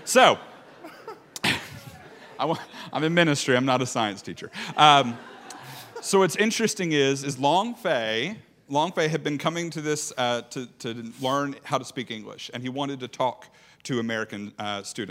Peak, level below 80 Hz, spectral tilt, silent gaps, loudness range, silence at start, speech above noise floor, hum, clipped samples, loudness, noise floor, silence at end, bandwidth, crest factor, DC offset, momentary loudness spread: 0 dBFS; -72 dBFS; -3.5 dB/octave; none; 8 LU; 0 s; 21 dB; none; under 0.1%; -25 LUFS; -46 dBFS; 0 s; 16 kHz; 26 dB; under 0.1%; 20 LU